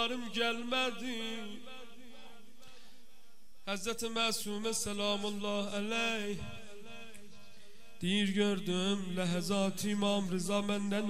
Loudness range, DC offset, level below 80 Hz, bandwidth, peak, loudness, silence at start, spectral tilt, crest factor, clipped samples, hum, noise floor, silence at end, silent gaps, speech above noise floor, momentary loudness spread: 7 LU; 0.7%; -66 dBFS; 15.5 kHz; -18 dBFS; -34 LUFS; 0 s; -4 dB/octave; 18 dB; under 0.1%; none; -66 dBFS; 0 s; none; 31 dB; 18 LU